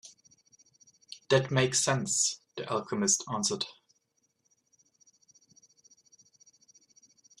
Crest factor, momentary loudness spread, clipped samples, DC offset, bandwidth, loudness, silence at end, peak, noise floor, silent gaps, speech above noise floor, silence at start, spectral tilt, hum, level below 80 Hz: 24 dB; 13 LU; under 0.1%; under 0.1%; 13 kHz; -28 LUFS; 3.7 s; -10 dBFS; -76 dBFS; none; 47 dB; 0.05 s; -3 dB/octave; none; -72 dBFS